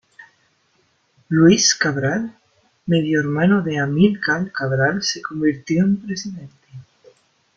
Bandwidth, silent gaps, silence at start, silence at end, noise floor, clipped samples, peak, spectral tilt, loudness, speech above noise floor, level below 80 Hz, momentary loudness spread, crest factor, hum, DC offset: 7.8 kHz; none; 0.2 s; 0.75 s; -63 dBFS; under 0.1%; -2 dBFS; -4.5 dB/octave; -18 LUFS; 45 dB; -56 dBFS; 14 LU; 18 dB; none; under 0.1%